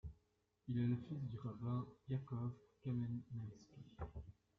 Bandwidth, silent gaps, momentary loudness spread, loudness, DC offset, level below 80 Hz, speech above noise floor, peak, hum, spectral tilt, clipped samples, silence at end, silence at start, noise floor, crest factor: 6.4 kHz; none; 16 LU; -46 LUFS; under 0.1%; -64 dBFS; 37 dB; -30 dBFS; none; -9.5 dB/octave; under 0.1%; 0.25 s; 0.05 s; -82 dBFS; 16 dB